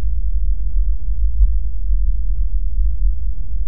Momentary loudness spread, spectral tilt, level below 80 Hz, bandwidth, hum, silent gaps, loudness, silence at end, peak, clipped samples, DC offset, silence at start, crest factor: 4 LU; -14.5 dB/octave; -18 dBFS; 0.5 kHz; none; none; -23 LUFS; 0 s; -2 dBFS; under 0.1%; 20%; 0 s; 14 dB